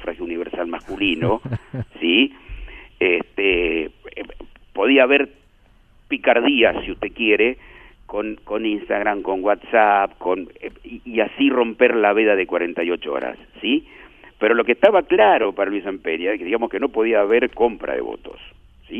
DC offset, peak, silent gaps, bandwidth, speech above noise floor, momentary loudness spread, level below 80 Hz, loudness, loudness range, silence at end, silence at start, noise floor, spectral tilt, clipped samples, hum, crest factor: under 0.1%; 0 dBFS; none; 3.9 kHz; 34 dB; 16 LU; -46 dBFS; -19 LUFS; 3 LU; 0 s; 0 s; -53 dBFS; -7.5 dB/octave; under 0.1%; none; 20 dB